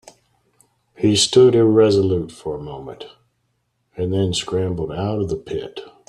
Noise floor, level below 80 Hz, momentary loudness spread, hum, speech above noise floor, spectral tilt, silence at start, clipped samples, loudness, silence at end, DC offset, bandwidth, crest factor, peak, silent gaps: -69 dBFS; -50 dBFS; 21 LU; none; 51 dB; -5.5 dB/octave; 1 s; under 0.1%; -18 LUFS; 0.2 s; under 0.1%; 12 kHz; 18 dB; -2 dBFS; none